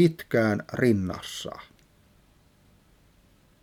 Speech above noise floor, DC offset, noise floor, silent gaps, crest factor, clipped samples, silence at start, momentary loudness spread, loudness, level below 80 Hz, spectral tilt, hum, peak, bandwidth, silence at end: 35 dB; under 0.1%; -60 dBFS; none; 20 dB; under 0.1%; 0 s; 14 LU; -26 LUFS; -60 dBFS; -6.5 dB/octave; none; -8 dBFS; 17 kHz; 2 s